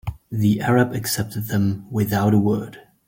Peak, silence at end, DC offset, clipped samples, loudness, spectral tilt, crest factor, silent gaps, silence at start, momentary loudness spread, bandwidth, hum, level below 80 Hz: -6 dBFS; 0.25 s; under 0.1%; under 0.1%; -21 LUFS; -6 dB/octave; 16 dB; none; 0.05 s; 7 LU; 17 kHz; none; -48 dBFS